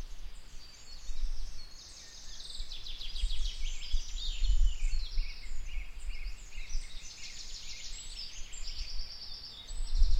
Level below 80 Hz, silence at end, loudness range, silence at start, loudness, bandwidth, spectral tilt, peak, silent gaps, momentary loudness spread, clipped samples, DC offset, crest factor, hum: -34 dBFS; 0 s; 5 LU; 0 s; -41 LUFS; 9 kHz; -2 dB/octave; -12 dBFS; none; 13 LU; under 0.1%; under 0.1%; 18 dB; none